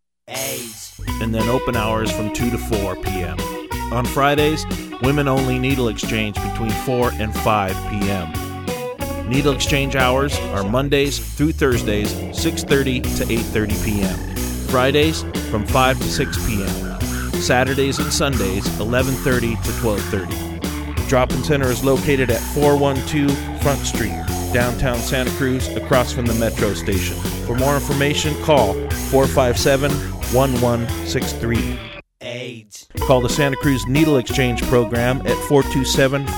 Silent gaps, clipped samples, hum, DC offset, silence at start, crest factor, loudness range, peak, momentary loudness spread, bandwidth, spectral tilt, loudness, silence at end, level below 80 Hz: none; under 0.1%; none; under 0.1%; 0.3 s; 18 dB; 3 LU; 0 dBFS; 8 LU; over 20 kHz; -5 dB/octave; -19 LUFS; 0 s; -30 dBFS